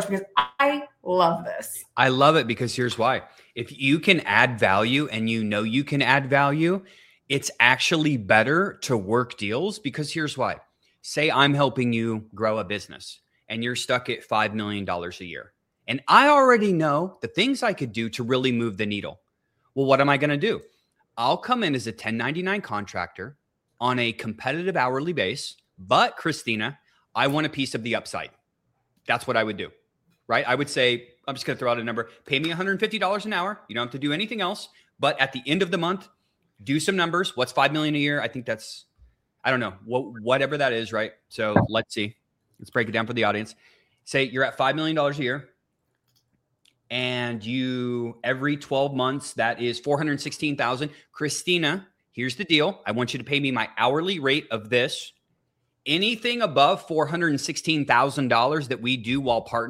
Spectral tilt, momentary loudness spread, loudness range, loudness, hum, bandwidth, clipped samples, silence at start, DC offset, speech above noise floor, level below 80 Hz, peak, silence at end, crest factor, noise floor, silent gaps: -4.5 dB/octave; 12 LU; 6 LU; -24 LUFS; none; 16 kHz; under 0.1%; 0 s; under 0.1%; 51 dB; -64 dBFS; 0 dBFS; 0 s; 24 dB; -75 dBFS; none